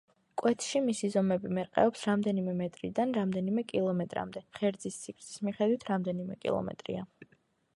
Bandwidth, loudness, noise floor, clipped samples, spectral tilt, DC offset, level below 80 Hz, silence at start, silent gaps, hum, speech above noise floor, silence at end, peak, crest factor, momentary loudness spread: 11.5 kHz; -32 LUFS; -70 dBFS; under 0.1%; -6 dB/octave; under 0.1%; -68 dBFS; 0.35 s; none; none; 38 dB; 0.5 s; -12 dBFS; 20 dB; 11 LU